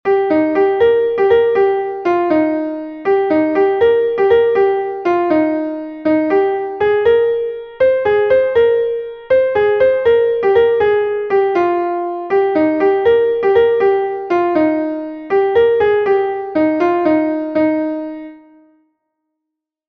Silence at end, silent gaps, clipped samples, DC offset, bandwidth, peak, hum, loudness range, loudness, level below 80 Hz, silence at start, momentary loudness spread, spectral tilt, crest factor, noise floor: 1.55 s; none; under 0.1%; under 0.1%; 5.6 kHz; -2 dBFS; none; 2 LU; -14 LUFS; -50 dBFS; 0.05 s; 7 LU; -7.5 dB/octave; 12 dB; -80 dBFS